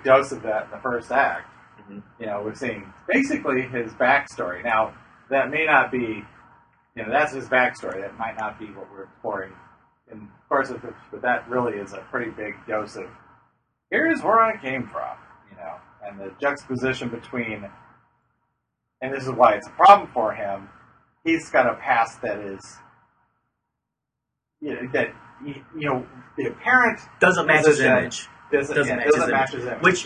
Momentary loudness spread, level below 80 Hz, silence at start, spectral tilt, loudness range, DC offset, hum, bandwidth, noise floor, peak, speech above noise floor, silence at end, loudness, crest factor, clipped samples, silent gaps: 20 LU; -58 dBFS; 0.05 s; -4.5 dB/octave; 11 LU; under 0.1%; none; 10.5 kHz; -83 dBFS; 0 dBFS; 60 dB; 0 s; -22 LUFS; 24 dB; under 0.1%; none